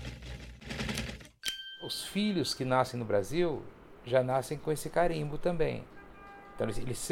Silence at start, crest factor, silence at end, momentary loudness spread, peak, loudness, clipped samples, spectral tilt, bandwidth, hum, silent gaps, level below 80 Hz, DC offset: 0 s; 20 dB; 0 s; 17 LU; -12 dBFS; -33 LUFS; under 0.1%; -5 dB/octave; 17.5 kHz; none; none; -48 dBFS; under 0.1%